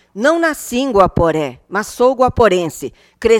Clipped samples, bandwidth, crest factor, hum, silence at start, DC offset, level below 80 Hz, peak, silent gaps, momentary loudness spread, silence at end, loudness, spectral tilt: under 0.1%; 16.5 kHz; 14 dB; none; 0.15 s; under 0.1%; -36 dBFS; 0 dBFS; none; 10 LU; 0 s; -15 LUFS; -5 dB/octave